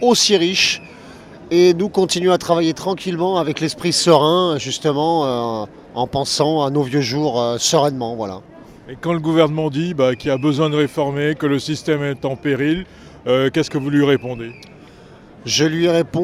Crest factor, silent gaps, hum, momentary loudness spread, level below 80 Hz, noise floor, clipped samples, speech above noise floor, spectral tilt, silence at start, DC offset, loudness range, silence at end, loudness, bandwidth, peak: 18 dB; none; none; 11 LU; -52 dBFS; -42 dBFS; under 0.1%; 25 dB; -4.5 dB/octave; 0 s; under 0.1%; 3 LU; 0 s; -17 LUFS; 14.5 kHz; 0 dBFS